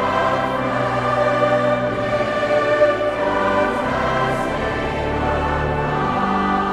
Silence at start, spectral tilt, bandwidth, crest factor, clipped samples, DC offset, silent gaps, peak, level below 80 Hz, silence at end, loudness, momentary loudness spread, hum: 0 s; -6.5 dB/octave; 12 kHz; 14 dB; under 0.1%; under 0.1%; none; -4 dBFS; -36 dBFS; 0 s; -19 LUFS; 4 LU; none